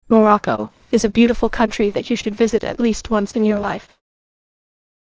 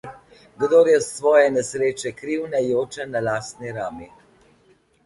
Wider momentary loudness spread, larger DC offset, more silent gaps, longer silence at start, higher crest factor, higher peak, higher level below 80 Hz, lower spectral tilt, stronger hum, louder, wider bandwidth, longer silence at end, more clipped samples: second, 8 LU vs 15 LU; neither; neither; about the same, 0.1 s vs 0.05 s; about the same, 18 dB vs 18 dB; first, 0 dBFS vs -4 dBFS; first, -40 dBFS vs -60 dBFS; about the same, -5.5 dB/octave vs -4.5 dB/octave; neither; first, -18 LUFS vs -21 LUFS; second, 8 kHz vs 11.5 kHz; first, 1.2 s vs 1 s; neither